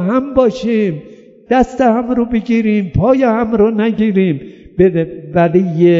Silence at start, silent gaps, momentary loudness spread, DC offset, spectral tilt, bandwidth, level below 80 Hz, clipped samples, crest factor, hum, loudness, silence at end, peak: 0 s; none; 6 LU; under 0.1%; -8.5 dB/octave; 7.6 kHz; -38 dBFS; under 0.1%; 12 dB; none; -14 LUFS; 0 s; 0 dBFS